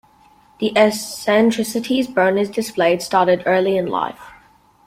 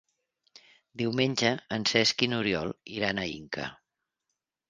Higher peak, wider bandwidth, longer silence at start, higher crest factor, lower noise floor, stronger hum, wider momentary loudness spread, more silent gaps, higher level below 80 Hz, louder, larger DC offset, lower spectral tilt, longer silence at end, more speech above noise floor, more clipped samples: first, -2 dBFS vs -6 dBFS; first, 16.5 kHz vs 10 kHz; second, 0.6 s vs 0.95 s; second, 16 dB vs 26 dB; second, -52 dBFS vs -85 dBFS; neither; second, 7 LU vs 13 LU; neither; about the same, -58 dBFS vs -62 dBFS; first, -18 LUFS vs -28 LUFS; neither; about the same, -4.5 dB/octave vs -4 dB/octave; second, 0.55 s vs 0.95 s; second, 34 dB vs 56 dB; neither